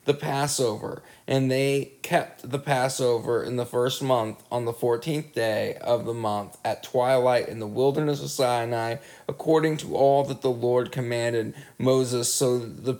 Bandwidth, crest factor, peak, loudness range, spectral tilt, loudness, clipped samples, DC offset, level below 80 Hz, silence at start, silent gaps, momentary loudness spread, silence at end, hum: 19.5 kHz; 18 dB; -8 dBFS; 2 LU; -5 dB/octave; -25 LUFS; under 0.1%; under 0.1%; -68 dBFS; 0.05 s; none; 8 LU; 0 s; none